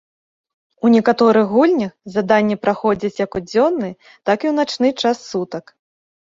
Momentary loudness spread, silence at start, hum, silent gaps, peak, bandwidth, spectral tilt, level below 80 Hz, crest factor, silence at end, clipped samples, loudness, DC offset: 11 LU; 0.85 s; none; none; -2 dBFS; 7.6 kHz; -6 dB/octave; -56 dBFS; 16 dB; 0.8 s; under 0.1%; -17 LUFS; under 0.1%